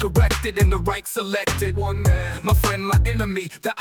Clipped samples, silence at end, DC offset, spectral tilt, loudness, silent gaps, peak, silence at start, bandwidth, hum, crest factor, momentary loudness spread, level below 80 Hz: under 0.1%; 0 s; under 0.1%; -5.5 dB/octave; -21 LUFS; none; -6 dBFS; 0 s; 19.5 kHz; none; 14 dB; 6 LU; -26 dBFS